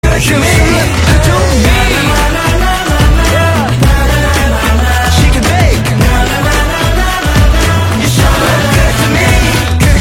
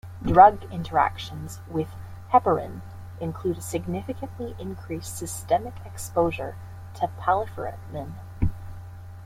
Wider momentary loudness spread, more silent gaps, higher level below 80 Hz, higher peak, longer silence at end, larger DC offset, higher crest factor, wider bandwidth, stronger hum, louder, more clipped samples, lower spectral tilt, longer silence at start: second, 2 LU vs 18 LU; neither; first, -12 dBFS vs -44 dBFS; about the same, 0 dBFS vs -2 dBFS; about the same, 0 s vs 0 s; neither; second, 8 dB vs 24 dB; about the same, 17 kHz vs 16 kHz; neither; first, -9 LUFS vs -25 LUFS; first, 0.2% vs under 0.1%; second, -4.5 dB/octave vs -6 dB/octave; about the same, 0.05 s vs 0.05 s